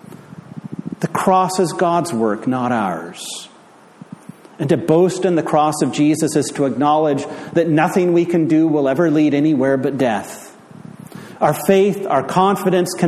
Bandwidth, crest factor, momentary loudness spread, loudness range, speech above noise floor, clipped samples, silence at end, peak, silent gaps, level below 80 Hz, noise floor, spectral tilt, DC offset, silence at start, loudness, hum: 14.5 kHz; 16 dB; 17 LU; 4 LU; 30 dB; under 0.1%; 0 s; -2 dBFS; none; -62 dBFS; -45 dBFS; -6 dB/octave; under 0.1%; 0.1 s; -17 LUFS; none